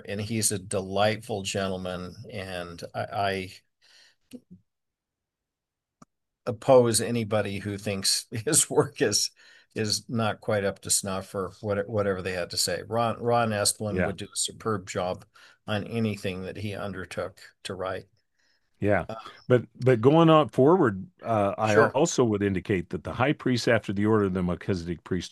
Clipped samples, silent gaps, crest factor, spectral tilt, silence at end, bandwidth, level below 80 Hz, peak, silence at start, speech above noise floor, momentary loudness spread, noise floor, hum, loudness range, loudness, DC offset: under 0.1%; none; 22 dB; -4.5 dB/octave; 0.05 s; 12.5 kHz; -62 dBFS; -4 dBFS; 0.05 s; 61 dB; 14 LU; -87 dBFS; none; 11 LU; -26 LUFS; under 0.1%